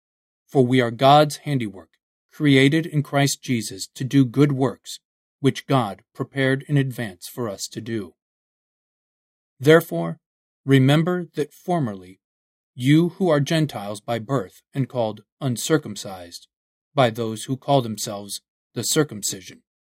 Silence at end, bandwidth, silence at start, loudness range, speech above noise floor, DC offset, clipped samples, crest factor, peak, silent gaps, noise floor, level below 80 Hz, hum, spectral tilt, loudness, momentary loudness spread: 0.45 s; 16 kHz; 0.55 s; 6 LU; over 69 dB; under 0.1%; under 0.1%; 22 dB; 0 dBFS; 2.03-2.29 s, 5.05-5.39 s, 8.22-9.57 s, 10.26-10.64 s, 12.24-12.74 s, 15.32-15.37 s, 16.56-16.92 s, 18.50-18.70 s; under -90 dBFS; -66 dBFS; none; -5.5 dB/octave; -21 LUFS; 16 LU